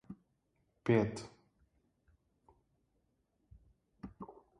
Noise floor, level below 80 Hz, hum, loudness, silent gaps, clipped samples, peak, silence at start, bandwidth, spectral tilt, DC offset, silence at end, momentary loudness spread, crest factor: -79 dBFS; -68 dBFS; none; -34 LUFS; none; under 0.1%; -16 dBFS; 0.1 s; 11 kHz; -7.5 dB/octave; under 0.1%; 0.3 s; 24 LU; 26 dB